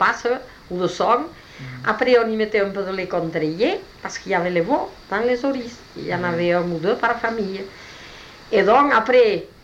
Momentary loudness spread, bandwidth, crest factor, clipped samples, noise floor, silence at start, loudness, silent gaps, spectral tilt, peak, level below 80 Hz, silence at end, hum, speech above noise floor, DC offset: 18 LU; 8.4 kHz; 16 dB; under 0.1%; -41 dBFS; 0 s; -20 LUFS; none; -5.5 dB/octave; -4 dBFS; -52 dBFS; 0.15 s; none; 21 dB; under 0.1%